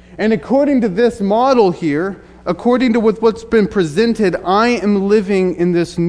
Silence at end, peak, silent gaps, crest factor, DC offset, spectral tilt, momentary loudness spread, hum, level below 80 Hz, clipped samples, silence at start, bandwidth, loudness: 0 s; 0 dBFS; none; 14 dB; under 0.1%; -7 dB/octave; 5 LU; none; -44 dBFS; under 0.1%; 0.15 s; 10.5 kHz; -14 LUFS